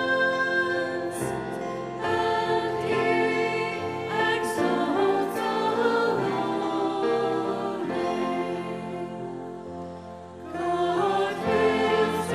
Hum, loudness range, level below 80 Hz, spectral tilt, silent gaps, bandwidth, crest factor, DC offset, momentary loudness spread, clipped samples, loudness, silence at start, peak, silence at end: none; 5 LU; -62 dBFS; -5 dB/octave; none; 15 kHz; 16 dB; under 0.1%; 11 LU; under 0.1%; -26 LUFS; 0 s; -10 dBFS; 0 s